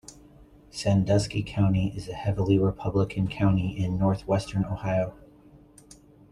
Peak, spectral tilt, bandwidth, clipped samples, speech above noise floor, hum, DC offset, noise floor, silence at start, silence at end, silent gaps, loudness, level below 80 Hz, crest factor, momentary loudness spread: -8 dBFS; -7 dB/octave; 11 kHz; under 0.1%; 28 dB; none; under 0.1%; -53 dBFS; 0.1 s; 0.75 s; none; -26 LUFS; -48 dBFS; 18 dB; 7 LU